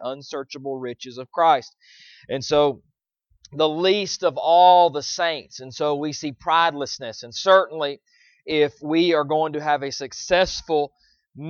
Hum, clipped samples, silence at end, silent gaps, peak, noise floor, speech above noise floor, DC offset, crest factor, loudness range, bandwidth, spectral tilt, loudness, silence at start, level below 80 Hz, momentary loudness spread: none; under 0.1%; 0 s; none; -2 dBFS; -67 dBFS; 46 dB; under 0.1%; 20 dB; 4 LU; 7.2 kHz; -4 dB/octave; -21 LUFS; 0 s; -56 dBFS; 15 LU